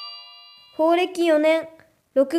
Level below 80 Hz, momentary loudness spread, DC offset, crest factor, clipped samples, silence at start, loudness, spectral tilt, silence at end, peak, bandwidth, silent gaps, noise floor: -76 dBFS; 21 LU; under 0.1%; 14 dB; under 0.1%; 0 s; -21 LUFS; -3 dB/octave; 0 s; -8 dBFS; 14 kHz; none; -47 dBFS